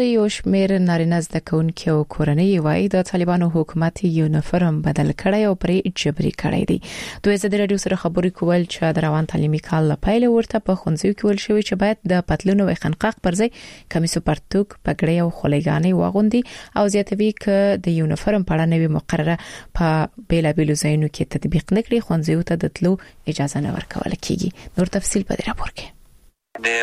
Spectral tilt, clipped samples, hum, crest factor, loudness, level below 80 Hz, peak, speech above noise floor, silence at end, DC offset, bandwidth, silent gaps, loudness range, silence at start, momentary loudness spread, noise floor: -6.5 dB/octave; under 0.1%; none; 16 dB; -20 LUFS; -38 dBFS; -4 dBFS; 33 dB; 0 s; under 0.1%; 13.5 kHz; none; 3 LU; 0 s; 6 LU; -52 dBFS